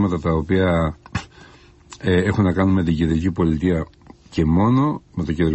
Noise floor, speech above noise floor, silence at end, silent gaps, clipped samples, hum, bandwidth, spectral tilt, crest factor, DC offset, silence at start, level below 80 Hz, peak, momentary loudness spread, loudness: -47 dBFS; 28 dB; 0 s; none; under 0.1%; none; 8.4 kHz; -8 dB/octave; 14 dB; under 0.1%; 0 s; -32 dBFS; -6 dBFS; 11 LU; -20 LUFS